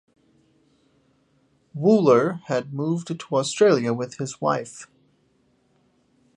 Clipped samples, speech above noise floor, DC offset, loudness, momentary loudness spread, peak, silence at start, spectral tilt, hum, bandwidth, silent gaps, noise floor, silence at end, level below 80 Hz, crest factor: under 0.1%; 43 dB; under 0.1%; -22 LUFS; 12 LU; -4 dBFS; 1.75 s; -6 dB/octave; none; 10.5 kHz; none; -64 dBFS; 1.5 s; -72 dBFS; 20 dB